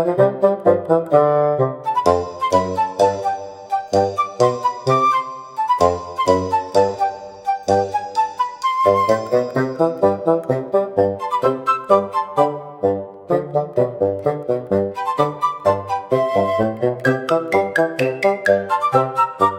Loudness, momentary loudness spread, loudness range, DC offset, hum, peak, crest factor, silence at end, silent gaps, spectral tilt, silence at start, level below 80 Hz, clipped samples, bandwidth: -18 LUFS; 6 LU; 2 LU; under 0.1%; none; 0 dBFS; 18 dB; 0 s; none; -6.5 dB/octave; 0 s; -58 dBFS; under 0.1%; 15.5 kHz